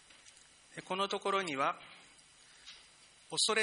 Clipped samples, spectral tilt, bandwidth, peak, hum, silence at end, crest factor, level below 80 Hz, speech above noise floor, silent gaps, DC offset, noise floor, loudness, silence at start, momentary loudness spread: under 0.1%; -1.5 dB/octave; 10.5 kHz; -18 dBFS; none; 0 s; 22 dB; -80 dBFS; 27 dB; none; under 0.1%; -61 dBFS; -35 LUFS; 0.25 s; 24 LU